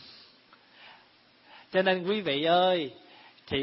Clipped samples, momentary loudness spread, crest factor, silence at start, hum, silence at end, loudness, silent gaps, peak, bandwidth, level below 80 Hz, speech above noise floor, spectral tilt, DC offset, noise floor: under 0.1%; 12 LU; 18 dB; 0.1 s; none; 0 s; -27 LUFS; none; -12 dBFS; 5.8 kHz; -66 dBFS; 34 dB; -9 dB/octave; under 0.1%; -60 dBFS